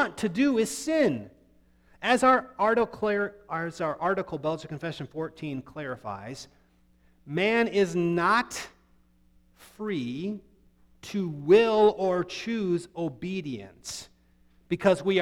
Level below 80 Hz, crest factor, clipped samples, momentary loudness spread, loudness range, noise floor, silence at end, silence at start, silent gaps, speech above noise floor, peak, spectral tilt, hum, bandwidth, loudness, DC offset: -62 dBFS; 20 dB; under 0.1%; 16 LU; 7 LU; -62 dBFS; 0 s; 0 s; none; 36 dB; -8 dBFS; -5 dB/octave; none; 16 kHz; -27 LUFS; under 0.1%